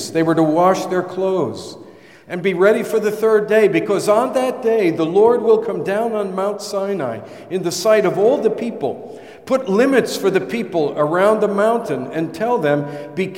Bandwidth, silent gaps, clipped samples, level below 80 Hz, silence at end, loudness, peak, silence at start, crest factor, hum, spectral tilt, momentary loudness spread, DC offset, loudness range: 16.5 kHz; none; under 0.1%; -68 dBFS; 0 s; -17 LUFS; -2 dBFS; 0 s; 16 dB; none; -5.5 dB/octave; 10 LU; 0.1%; 3 LU